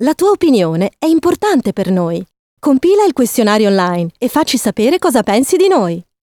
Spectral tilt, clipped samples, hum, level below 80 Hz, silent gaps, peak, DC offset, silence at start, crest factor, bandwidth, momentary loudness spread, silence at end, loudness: -5 dB/octave; under 0.1%; none; -50 dBFS; 2.39-2.57 s; 0 dBFS; under 0.1%; 0 s; 12 dB; over 20 kHz; 5 LU; 0.25 s; -13 LUFS